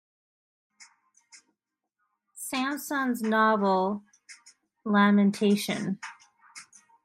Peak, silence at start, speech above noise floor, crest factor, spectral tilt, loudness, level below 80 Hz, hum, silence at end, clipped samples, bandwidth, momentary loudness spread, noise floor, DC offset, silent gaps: -10 dBFS; 0.8 s; 59 dB; 20 dB; -5.5 dB/octave; -26 LUFS; -78 dBFS; none; 0.45 s; under 0.1%; 15.5 kHz; 19 LU; -83 dBFS; under 0.1%; none